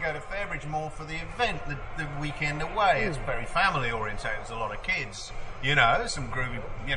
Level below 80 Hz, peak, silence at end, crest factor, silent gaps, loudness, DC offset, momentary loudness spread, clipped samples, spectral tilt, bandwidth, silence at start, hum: -42 dBFS; -8 dBFS; 0 s; 20 dB; none; -29 LUFS; under 0.1%; 12 LU; under 0.1%; -4 dB/octave; 11 kHz; 0 s; none